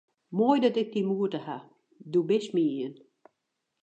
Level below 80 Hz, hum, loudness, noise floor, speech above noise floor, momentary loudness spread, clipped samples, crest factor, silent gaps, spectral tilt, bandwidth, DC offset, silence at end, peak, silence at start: -86 dBFS; none; -28 LUFS; -82 dBFS; 55 dB; 14 LU; under 0.1%; 18 dB; none; -7 dB/octave; 8.8 kHz; under 0.1%; 0.9 s; -10 dBFS; 0.3 s